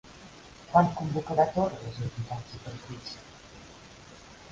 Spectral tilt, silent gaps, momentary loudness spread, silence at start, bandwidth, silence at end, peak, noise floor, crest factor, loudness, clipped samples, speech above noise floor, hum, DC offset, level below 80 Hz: -7 dB/octave; none; 25 LU; 0.05 s; 7.8 kHz; 0.05 s; -8 dBFS; -50 dBFS; 24 dB; -29 LUFS; under 0.1%; 21 dB; none; under 0.1%; -56 dBFS